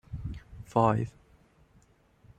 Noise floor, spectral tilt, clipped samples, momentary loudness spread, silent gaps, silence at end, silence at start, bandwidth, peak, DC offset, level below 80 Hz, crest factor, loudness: -63 dBFS; -8.5 dB/octave; under 0.1%; 16 LU; none; 1.3 s; 0.1 s; 9.4 kHz; -10 dBFS; under 0.1%; -50 dBFS; 24 dB; -30 LUFS